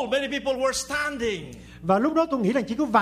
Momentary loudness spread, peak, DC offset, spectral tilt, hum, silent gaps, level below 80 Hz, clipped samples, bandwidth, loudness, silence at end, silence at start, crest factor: 9 LU; -6 dBFS; under 0.1%; -4.5 dB/octave; none; none; -52 dBFS; under 0.1%; 15.5 kHz; -25 LUFS; 0 s; 0 s; 18 dB